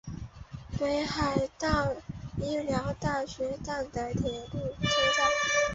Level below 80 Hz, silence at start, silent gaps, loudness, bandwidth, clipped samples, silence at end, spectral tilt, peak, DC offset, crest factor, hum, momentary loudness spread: -46 dBFS; 0.05 s; none; -30 LUFS; 8 kHz; under 0.1%; 0 s; -4 dB/octave; -12 dBFS; under 0.1%; 18 dB; none; 14 LU